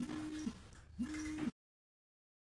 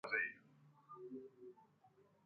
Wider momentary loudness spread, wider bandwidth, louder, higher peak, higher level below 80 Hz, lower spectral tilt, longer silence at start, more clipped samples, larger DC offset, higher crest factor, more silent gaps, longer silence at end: second, 10 LU vs 22 LU; first, 11.5 kHz vs 5.8 kHz; about the same, -44 LUFS vs -46 LUFS; second, -30 dBFS vs -26 dBFS; first, -62 dBFS vs under -90 dBFS; first, -5 dB/octave vs -2 dB/octave; about the same, 0 s vs 0.05 s; neither; neither; second, 16 dB vs 24 dB; neither; first, 1 s vs 0.25 s